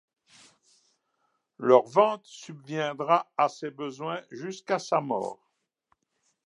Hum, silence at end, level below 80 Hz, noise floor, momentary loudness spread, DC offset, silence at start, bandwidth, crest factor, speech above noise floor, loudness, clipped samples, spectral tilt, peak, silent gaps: none; 1.15 s; -84 dBFS; -76 dBFS; 16 LU; under 0.1%; 1.6 s; 11 kHz; 24 dB; 49 dB; -27 LUFS; under 0.1%; -5.5 dB/octave; -4 dBFS; none